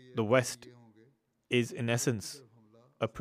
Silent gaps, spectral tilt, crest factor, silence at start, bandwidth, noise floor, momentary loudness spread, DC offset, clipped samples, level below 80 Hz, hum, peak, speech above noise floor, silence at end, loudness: none; -4.5 dB/octave; 22 dB; 0.05 s; 15.5 kHz; -67 dBFS; 15 LU; under 0.1%; under 0.1%; -74 dBFS; none; -12 dBFS; 36 dB; 0 s; -31 LUFS